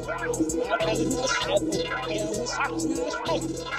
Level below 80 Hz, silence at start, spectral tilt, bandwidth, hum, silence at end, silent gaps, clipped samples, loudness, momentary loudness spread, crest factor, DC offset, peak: -46 dBFS; 0 s; -3.5 dB/octave; 15.5 kHz; none; 0 s; none; under 0.1%; -27 LUFS; 4 LU; 16 dB; under 0.1%; -12 dBFS